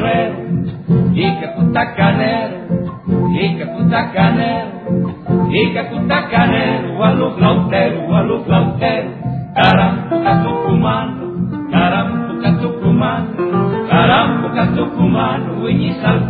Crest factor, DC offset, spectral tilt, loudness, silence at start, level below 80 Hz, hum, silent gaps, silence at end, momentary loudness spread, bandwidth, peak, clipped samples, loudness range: 14 dB; under 0.1%; -10 dB/octave; -15 LUFS; 0 s; -38 dBFS; none; none; 0 s; 7 LU; 4.7 kHz; 0 dBFS; under 0.1%; 2 LU